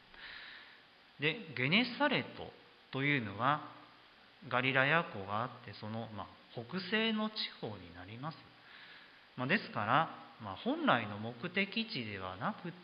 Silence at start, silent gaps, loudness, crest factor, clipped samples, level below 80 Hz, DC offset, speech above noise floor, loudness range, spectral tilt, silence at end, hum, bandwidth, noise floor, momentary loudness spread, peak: 0.15 s; none; -35 LUFS; 24 dB; under 0.1%; -72 dBFS; under 0.1%; 25 dB; 5 LU; -8 dB/octave; 0 s; none; 5.8 kHz; -61 dBFS; 20 LU; -14 dBFS